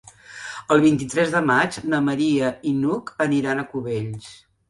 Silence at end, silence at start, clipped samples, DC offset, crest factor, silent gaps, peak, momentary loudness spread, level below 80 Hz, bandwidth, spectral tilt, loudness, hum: 0.35 s; 0.3 s; under 0.1%; under 0.1%; 18 dB; none; -4 dBFS; 16 LU; -58 dBFS; 11.5 kHz; -6 dB/octave; -21 LUFS; none